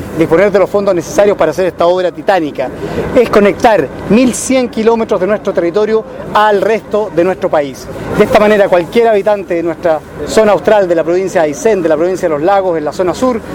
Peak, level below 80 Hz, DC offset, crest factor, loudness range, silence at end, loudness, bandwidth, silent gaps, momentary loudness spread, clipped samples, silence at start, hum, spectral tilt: 0 dBFS; -38 dBFS; under 0.1%; 10 dB; 1 LU; 0 s; -11 LUFS; 17 kHz; none; 6 LU; 0.4%; 0 s; none; -5 dB/octave